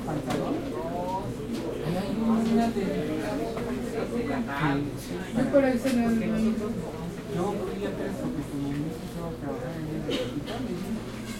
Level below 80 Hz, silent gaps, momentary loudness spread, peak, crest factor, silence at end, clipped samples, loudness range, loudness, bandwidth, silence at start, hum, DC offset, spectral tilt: -46 dBFS; none; 9 LU; -10 dBFS; 20 dB; 0 s; under 0.1%; 5 LU; -29 LUFS; 16.5 kHz; 0 s; none; under 0.1%; -6.5 dB/octave